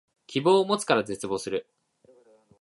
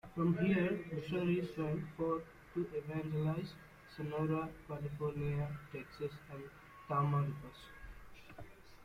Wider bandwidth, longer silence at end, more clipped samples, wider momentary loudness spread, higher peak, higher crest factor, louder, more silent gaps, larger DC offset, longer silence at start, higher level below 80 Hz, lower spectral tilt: second, 11.5 kHz vs 15.5 kHz; first, 1 s vs 0 s; neither; second, 11 LU vs 21 LU; first, -6 dBFS vs -22 dBFS; first, 22 dB vs 16 dB; first, -26 LUFS vs -39 LUFS; neither; neither; first, 0.3 s vs 0.05 s; second, -68 dBFS vs -62 dBFS; second, -4.5 dB/octave vs -8.5 dB/octave